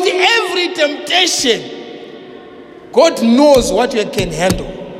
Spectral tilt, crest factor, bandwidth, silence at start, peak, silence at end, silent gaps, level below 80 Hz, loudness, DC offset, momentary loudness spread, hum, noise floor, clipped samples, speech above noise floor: -3 dB/octave; 14 dB; 16.5 kHz; 0 s; 0 dBFS; 0 s; none; -36 dBFS; -13 LUFS; under 0.1%; 20 LU; none; -35 dBFS; under 0.1%; 23 dB